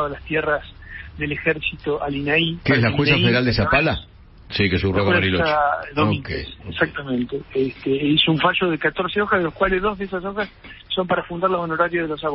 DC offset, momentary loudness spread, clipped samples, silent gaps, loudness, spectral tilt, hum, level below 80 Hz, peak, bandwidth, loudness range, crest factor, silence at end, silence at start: under 0.1%; 10 LU; under 0.1%; none; -20 LUFS; -10 dB/octave; none; -40 dBFS; -4 dBFS; 5.8 kHz; 3 LU; 18 dB; 0 s; 0 s